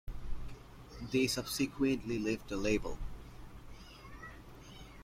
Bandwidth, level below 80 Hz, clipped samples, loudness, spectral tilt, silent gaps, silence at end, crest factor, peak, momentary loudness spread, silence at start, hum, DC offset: 16.5 kHz; -48 dBFS; under 0.1%; -35 LUFS; -4.5 dB/octave; none; 0 s; 18 dB; -20 dBFS; 21 LU; 0.05 s; none; under 0.1%